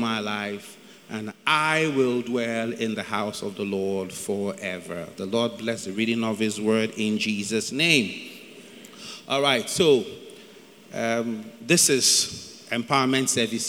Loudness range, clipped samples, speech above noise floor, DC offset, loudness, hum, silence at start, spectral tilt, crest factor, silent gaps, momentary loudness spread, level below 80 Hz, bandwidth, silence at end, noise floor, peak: 6 LU; under 0.1%; 24 dB; under 0.1%; -24 LUFS; none; 0 s; -3 dB/octave; 20 dB; none; 18 LU; -70 dBFS; 18 kHz; 0 s; -48 dBFS; -4 dBFS